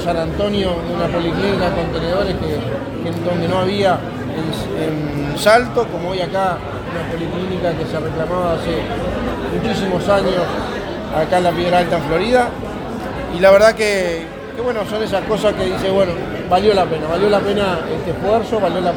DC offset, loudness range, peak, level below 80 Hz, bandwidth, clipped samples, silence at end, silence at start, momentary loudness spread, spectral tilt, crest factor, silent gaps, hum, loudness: under 0.1%; 4 LU; 0 dBFS; -36 dBFS; 19 kHz; under 0.1%; 0 s; 0 s; 9 LU; -6 dB/octave; 18 dB; none; none; -18 LUFS